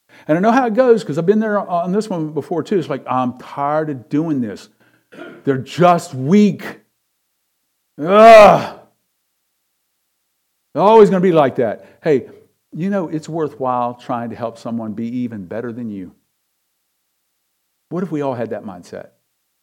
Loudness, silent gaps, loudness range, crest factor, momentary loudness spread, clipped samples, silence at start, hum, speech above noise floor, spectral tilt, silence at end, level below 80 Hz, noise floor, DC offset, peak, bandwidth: -15 LUFS; none; 16 LU; 16 dB; 18 LU; 0.5%; 0.3 s; none; 55 dB; -7 dB/octave; 0.6 s; -56 dBFS; -69 dBFS; under 0.1%; 0 dBFS; 15 kHz